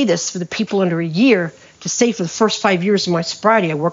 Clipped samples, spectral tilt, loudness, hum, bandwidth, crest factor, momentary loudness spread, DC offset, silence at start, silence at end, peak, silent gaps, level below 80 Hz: under 0.1%; -4.5 dB/octave; -17 LUFS; none; 7.6 kHz; 16 dB; 8 LU; under 0.1%; 0 s; 0 s; -2 dBFS; none; -62 dBFS